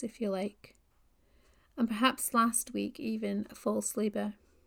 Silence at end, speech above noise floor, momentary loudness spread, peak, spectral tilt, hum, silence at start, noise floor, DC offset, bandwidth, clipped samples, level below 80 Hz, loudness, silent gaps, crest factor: 0.35 s; 35 dB; 10 LU; -12 dBFS; -3.5 dB/octave; none; 0 s; -68 dBFS; under 0.1%; 19.5 kHz; under 0.1%; -66 dBFS; -32 LUFS; none; 22 dB